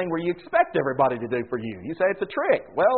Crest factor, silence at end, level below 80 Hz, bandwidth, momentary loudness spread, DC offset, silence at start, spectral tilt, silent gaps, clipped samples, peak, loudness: 16 dB; 0 s; -62 dBFS; 4.4 kHz; 8 LU; 0.1%; 0 s; -4.5 dB/octave; none; under 0.1%; -8 dBFS; -24 LUFS